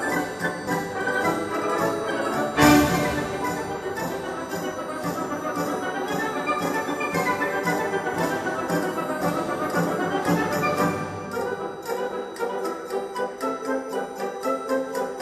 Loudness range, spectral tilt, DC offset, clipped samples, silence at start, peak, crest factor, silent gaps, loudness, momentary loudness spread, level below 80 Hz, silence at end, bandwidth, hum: 6 LU; -5 dB/octave; under 0.1%; under 0.1%; 0 s; -4 dBFS; 20 dB; none; -25 LUFS; 7 LU; -50 dBFS; 0 s; 15 kHz; none